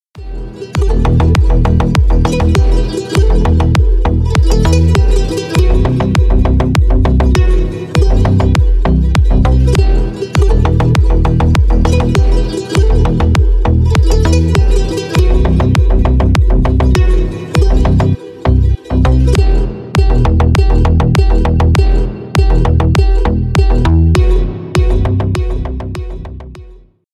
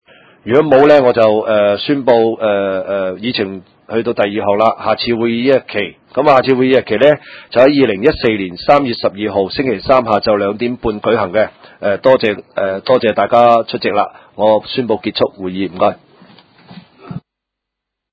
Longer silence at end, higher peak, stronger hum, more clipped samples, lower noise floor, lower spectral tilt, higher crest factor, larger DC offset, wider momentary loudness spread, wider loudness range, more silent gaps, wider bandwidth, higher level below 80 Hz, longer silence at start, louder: second, 0.4 s vs 0.95 s; about the same, 0 dBFS vs 0 dBFS; neither; second, under 0.1% vs 0.2%; second, -38 dBFS vs -79 dBFS; about the same, -7 dB/octave vs -7.5 dB/octave; about the same, 10 dB vs 14 dB; neither; second, 5 LU vs 9 LU; second, 1 LU vs 5 LU; neither; first, 11.5 kHz vs 8 kHz; first, -12 dBFS vs -46 dBFS; second, 0.15 s vs 0.45 s; about the same, -12 LUFS vs -13 LUFS